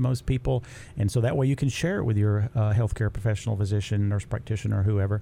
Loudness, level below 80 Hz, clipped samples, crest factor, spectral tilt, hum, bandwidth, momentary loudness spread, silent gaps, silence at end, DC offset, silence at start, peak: -26 LUFS; -42 dBFS; under 0.1%; 12 dB; -7 dB/octave; none; 11.5 kHz; 5 LU; none; 0 s; under 0.1%; 0 s; -12 dBFS